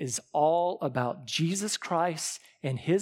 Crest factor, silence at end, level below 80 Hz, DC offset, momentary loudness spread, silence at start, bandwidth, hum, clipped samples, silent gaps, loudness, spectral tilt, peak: 16 dB; 0 s; -76 dBFS; under 0.1%; 9 LU; 0 s; 16.5 kHz; none; under 0.1%; none; -29 LUFS; -4.5 dB/octave; -14 dBFS